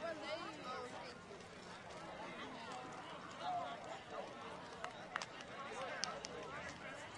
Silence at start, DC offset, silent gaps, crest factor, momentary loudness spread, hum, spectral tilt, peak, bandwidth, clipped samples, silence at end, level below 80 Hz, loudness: 0 s; under 0.1%; none; 32 dB; 8 LU; none; -3 dB/octave; -18 dBFS; 11.5 kHz; under 0.1%; 0 s; -76 dBFS; -48 LUFS